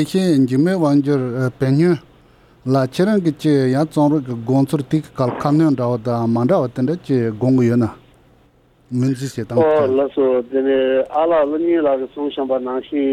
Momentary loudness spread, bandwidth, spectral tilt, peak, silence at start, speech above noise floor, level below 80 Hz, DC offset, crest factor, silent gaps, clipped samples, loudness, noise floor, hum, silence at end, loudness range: 6 LU; 14.5 kHz; -8 dB/octave; -4 dBFS; 0 s; 37 dB; -54 dBFS; under 0.1%; 14 dB; none; under 0.1%; -17 LUFS; -53 dBFS; none; 0 s; 2 LU